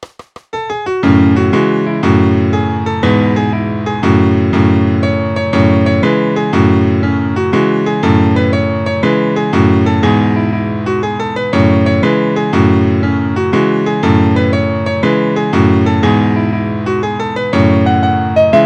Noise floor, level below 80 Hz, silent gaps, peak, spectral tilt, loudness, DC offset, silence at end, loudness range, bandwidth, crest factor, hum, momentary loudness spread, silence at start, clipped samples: -35 dBFS; -38 dBFS; none; 0 dBFS; -8 dB/octave; -12 LUFS; under 0.1%; 0 s; 1 LU; 8.2 kHz; 12 dB; none; 6 LU; 0 s; under 0.1%